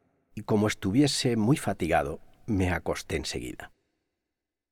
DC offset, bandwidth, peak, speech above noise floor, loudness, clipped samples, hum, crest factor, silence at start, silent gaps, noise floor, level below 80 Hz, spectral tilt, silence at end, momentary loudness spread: under 0.1%; 17 kHz; -10 dBFS; 60 dB; -27 LUFS; under 0.1%; none; 18 dB; 0.35 s; none; -87 dBFS; -50 dBFS; -5 dB/octave; 1.05 s; 17 LU